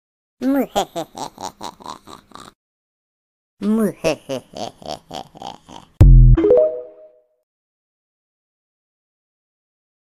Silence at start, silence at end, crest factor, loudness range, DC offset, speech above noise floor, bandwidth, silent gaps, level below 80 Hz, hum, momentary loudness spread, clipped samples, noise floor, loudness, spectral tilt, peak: 0.4 s; 3.2 s; 18 dB; 9 LU; under 0.1%; 27 dB; 13.5 kHz; 2.55-3.57 s; -22 dBFS; none; 23 LU; under 0.1%; -48 dBFS; -17 LUFS; -7.5 dB/octave; 0 dBFS